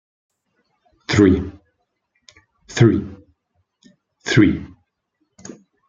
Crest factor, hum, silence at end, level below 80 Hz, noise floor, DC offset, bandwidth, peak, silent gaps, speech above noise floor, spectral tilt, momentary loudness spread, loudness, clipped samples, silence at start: 20 dB; none; 1.25 s; -46 dBFS; -71 dBFS; under 0.1%; 7.8 kHz; -2 dBFS; none; 56 dB; -6.5 dB/octave; 25 LU; -17 LUFS; under 0.1%; 1.1 s